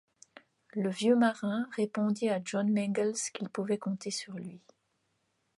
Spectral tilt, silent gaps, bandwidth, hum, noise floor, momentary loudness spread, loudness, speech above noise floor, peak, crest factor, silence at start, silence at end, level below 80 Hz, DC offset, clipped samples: -5 dB/octave; none; 11.5 kHz; none; -77 dBFS; 11 LU; -31 LUFS; 46 dB; -14 dBFS; 18 dB; 0.75 s; 1 s; -80 dBFS; under 0.1%; under 0.1%